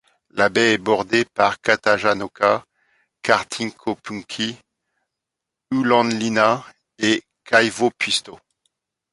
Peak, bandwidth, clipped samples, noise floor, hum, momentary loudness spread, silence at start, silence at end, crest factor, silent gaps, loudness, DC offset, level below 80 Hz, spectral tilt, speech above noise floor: 0 dBFS; 11.5 kHz; under 0.1%; -84 dBFS; none; 10 LU; 0.35 s; 0.8 s; 20 dB; none; -20 LUFS; under 0.1%; -60 dBFS; -3.5 dB/octave; 65 dB